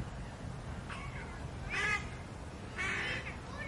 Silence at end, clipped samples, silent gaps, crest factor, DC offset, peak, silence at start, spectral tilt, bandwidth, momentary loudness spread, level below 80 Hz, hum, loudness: 0 s; under 0.1%; none; 18 dB; under 0.1%; -22 dBFS; 0 s; -4 dB/octave; 11.5 kHz; 11 LU; -50 dBFS; none; -39 LUFS